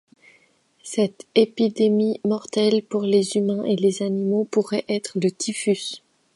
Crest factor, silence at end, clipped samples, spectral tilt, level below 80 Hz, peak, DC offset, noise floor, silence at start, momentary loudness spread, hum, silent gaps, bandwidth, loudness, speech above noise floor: 20 dB; 0.4 s; under 0.1%; -5.5 dB/octave; -72 dBFS; -2 dBFS; under 0.1%; -60 dBFS; 0.85 s; 6 LU; none; none; 11.5 kHz; -22 LUFS; 39 dB